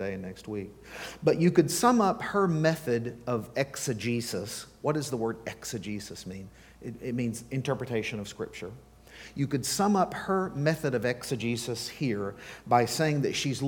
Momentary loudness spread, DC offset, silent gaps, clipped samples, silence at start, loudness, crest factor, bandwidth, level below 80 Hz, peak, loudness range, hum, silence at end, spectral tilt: 17 LU; under 0.1%; none; under 0.1%; 0 s; -29 LUFS; 20 dB; 19 kHz; -60 dBFS; -8 dBFS; 8 LU; none; 0 s; -5 dB/octave